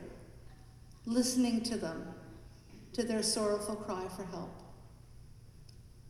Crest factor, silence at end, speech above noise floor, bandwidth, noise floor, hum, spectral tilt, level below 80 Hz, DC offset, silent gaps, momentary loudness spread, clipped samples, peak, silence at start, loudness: 18 dB; 0 s; 21 dB; 15 kHz; -55 dBFS; none; -4 dB/octave; -58 dBFS; under 0.1%; none; 26 LU; under 0.1%; -18 dBFS; 0 s; -35 LUFS